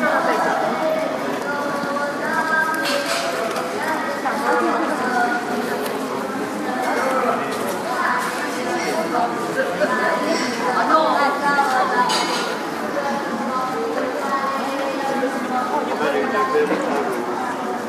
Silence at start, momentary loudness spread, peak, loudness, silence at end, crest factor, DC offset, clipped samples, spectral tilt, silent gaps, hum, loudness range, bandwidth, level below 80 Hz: 0 s; 6 LU; -4 dBFS; -21 LUFS; 0 s; 16 dB; under 0.1%; under 0.1%; -3.5 dB/octave; none; none; 3 LU; 15.5 kHz; -68 dBFS